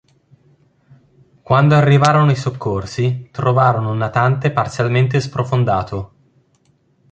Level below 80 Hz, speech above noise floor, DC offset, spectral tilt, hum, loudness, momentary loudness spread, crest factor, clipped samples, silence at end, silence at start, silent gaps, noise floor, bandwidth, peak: -46 dBFS; 43 dB; under 0.1%; -7 dB/octave; none; -16 LUFS; 10 LU; 16 dB; under 0.1%; 1.05 s; 1.5 s; none; -58 dBFS; 8.8 kHz; 0 dBFS